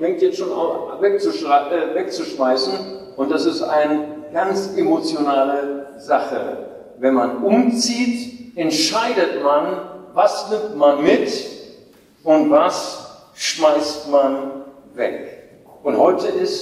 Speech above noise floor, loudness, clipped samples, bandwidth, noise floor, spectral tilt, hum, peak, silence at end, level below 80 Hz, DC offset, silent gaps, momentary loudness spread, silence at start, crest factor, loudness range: 30 dB; -19 LUFS; under 0.1%; 14.5 kHz; -48 dBFS; -3.5 dB/octave; none; -2 dBFS; 0 s; -64 dBFS; under 0.1%; none; 13 LU; 0 s; 16 dB; 2 LU